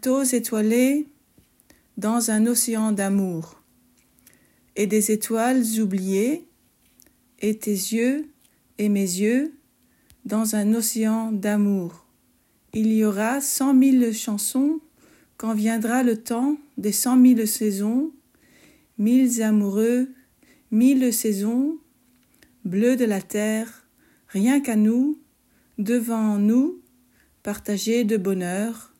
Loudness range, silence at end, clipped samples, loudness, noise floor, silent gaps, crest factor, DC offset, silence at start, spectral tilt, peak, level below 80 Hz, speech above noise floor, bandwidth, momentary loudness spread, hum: 4 LU; 0.15 s; under 0.1%; -22 LUFS; -63 dBFS; none; 16 dB; under 0.1%; 0.05 s; -5 dB/octave; -8 dBFS; -68 dBFS; 42 dB; 16.5 kHz; 13 LU; none